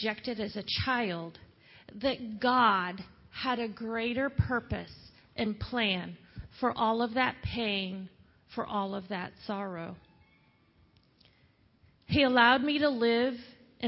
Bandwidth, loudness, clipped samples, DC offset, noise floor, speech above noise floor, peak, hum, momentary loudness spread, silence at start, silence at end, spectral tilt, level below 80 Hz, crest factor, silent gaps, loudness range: 5.8 kHz; -30 LUFS; under 0.1%; under 0.1%; -66 dBFS; 35 dB; -8 dBFS; none; 19 LU; 0 s; 0 s; -9 dB/octave; -52 dBFS; 24 dB; none; 10 LU